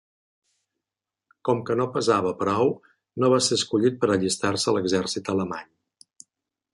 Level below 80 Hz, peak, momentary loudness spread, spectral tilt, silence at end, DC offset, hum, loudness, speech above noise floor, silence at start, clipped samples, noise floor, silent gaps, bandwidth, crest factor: -56 dBFS; -6 dBFS; 9 LU; -4.5 dB/octave; 1.1 s; under 0.1%; none; -24 LUFS; 65 dB; 1.45 s; under 0.1%; -88 dBFS; none; 11.5 kHz; 18 dB